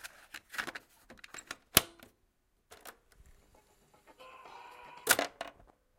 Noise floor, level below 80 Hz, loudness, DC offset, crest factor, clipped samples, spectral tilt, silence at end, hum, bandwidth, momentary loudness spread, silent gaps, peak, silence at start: -74 dBFS; -64 dBFS; -32 LUFS; under 0.1%; 38 dB; under 0.1%; -1 dB/octave; 0.5 s; none; 16.5 kHz; 25 LU; none; 0 dBFS; 0.05 s